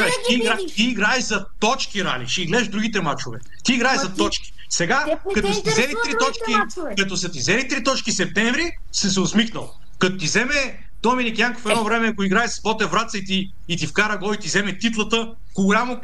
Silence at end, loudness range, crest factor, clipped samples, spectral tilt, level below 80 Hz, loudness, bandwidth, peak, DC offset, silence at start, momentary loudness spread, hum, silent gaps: 0 s; 1 LU; 16 dB; under 0.1%; -3 dB/octave; -44 dBFS; -21 LUFS; 12.5 kHz; -4 dBFS; 4%; 0 s; 6 LU; none; none